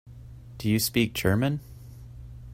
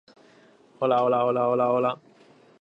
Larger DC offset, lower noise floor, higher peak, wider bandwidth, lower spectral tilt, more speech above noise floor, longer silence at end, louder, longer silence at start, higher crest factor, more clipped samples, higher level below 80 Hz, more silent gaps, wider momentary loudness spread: neither; second, -45 dBFS vs -56 dBFS; about the same, -8 dBFS vs -10 dBFS; first, 16 kHz vs 7.2 kHz; second, -5 dB/octave vs -8 dB/octave; second, 20 dB vs 33 dB; second, 0 s vs 0.65 s; about the same, -26 LUFS vs -24 LUFS; second, 0.05 s vs 0.8 s; about the same, 20 dB vs 16 dB; neither; first, -48 dBFS vs -76 dBFS; neither; first, 22 LU vs 7 LU